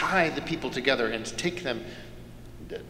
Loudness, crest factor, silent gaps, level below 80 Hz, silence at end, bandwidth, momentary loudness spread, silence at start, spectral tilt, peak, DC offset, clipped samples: -28 LUFS; 22 dB; none; -50 dBFS; 0 s; 16 kHz; 21 LU; 0 s; -4 dB/octave; -6 dBFS; under 0.1%; under 0.1%